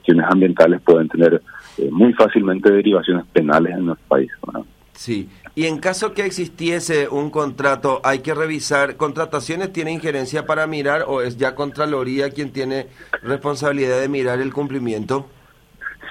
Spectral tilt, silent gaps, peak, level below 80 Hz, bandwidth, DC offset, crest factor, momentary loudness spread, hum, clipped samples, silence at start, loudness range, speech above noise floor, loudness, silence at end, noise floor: -5.5 dB/octave; none; 0 dBFS; -54 dBFS; 14.5 kHz; under 0.1%; 18 dB; 12 LU; none; under 0.1%; 0.05 s; 7 LU; 23 dB; -18 LUFS; 0 s; -41 dBFS